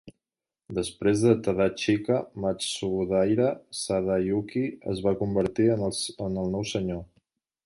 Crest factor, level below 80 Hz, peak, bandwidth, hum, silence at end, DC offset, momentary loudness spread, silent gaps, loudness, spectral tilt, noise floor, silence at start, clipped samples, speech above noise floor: 20 dB; -52 dBFS; -8 dBFS; 11.5 kHz; none; 0.6 s; under 0.1%; 8 LU; none; -27 LUFS; -5.5 dB/octave; -89 dBFS; 0.05 s; under 0.1%; 63 dB